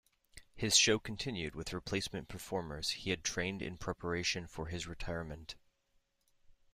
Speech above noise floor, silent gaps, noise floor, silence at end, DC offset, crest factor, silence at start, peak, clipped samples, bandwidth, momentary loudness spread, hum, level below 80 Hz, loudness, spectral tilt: 39 dB; none; -77 dBFS; 0.2 s; under 0.1%; 26 dB; 0.35 s; -14 dBFS; under 0.1%; 15.5 kHz; 15 LU; none; -56 dBFS; -36 LUFS; -2.5 dB/octave